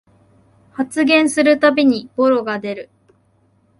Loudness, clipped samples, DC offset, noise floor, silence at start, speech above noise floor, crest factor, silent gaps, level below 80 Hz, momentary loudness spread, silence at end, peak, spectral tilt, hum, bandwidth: -15 LUFS; under 0.1%; under 0.1%; -58 dBFS; 0.8 s; 43 dB; 18 dB; none; -64 dBFS; 14 LU; 0.95 s; 0 dBFS; -4 dB/octave; none; 11.5 kHz